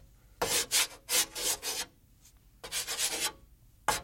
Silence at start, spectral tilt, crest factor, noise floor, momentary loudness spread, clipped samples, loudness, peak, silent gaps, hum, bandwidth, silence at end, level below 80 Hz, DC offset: 0.4 s; 0.5 dB/octave; 22 dB; -60 dBFS; 10 LU; under 0.1%; -30 LUFS; -12 dBFS; none; none; 16.5 kHz; 0 s; -58 dBFS; under 0.1%